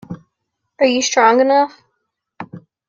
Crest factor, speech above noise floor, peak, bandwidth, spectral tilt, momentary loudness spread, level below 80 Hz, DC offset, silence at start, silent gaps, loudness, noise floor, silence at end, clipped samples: 16 dB; 61 dB; -2 dBFS; 7.6 kHz; -3 dB/octave; 23 LU; -64 dBFS; under 0.1%; 0.1 s; none; -14 LUFS; -75 dBFS; 0.3 s; under 0.1%